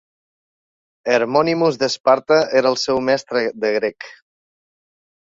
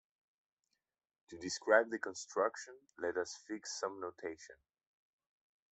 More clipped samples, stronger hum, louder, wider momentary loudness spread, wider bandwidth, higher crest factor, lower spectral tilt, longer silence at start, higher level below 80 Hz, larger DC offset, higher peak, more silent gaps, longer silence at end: neither; neither; first, -18 LUFS vs -38 LUFS; second, 9 LU vs 21 LU; about the same, 7.8 kHz vs 8.2 kHz; second, 18 dB vs 28 dB; first, -4.5 dB/octave vs -2.5 dB/octave; second, 1.05 s vs 1.3 s; first, -60 dBFS vs -84 dBFS; neither; first, -2 dBFS vs -14 dBFS; first, 2.00-2.04 s vs none; about the same, 1.1 s vs 1.2 s